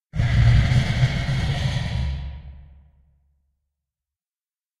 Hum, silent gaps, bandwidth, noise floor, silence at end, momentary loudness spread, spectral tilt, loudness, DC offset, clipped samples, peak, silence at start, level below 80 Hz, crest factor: none; none; 10.5 kHz; under -90 dBFS; 2.2 s; 15 LU; -6.5 dB/octave; -21 LUFS; under 0.1%; under 0.1%; -6 dBFS; 0.15 s; -30 dBFS; 18 dB